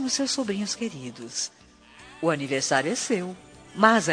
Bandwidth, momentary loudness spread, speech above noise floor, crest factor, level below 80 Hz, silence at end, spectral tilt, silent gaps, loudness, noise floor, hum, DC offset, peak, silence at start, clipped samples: 10 kHz; 15 LU; 26 dB; 24 dB; -64 dBFS; 0 s; -3 dB/octave; none; -26 LUFS; -51 dBFS; none; under 0.1%; -4 dBFS; 0 s; under 0.1%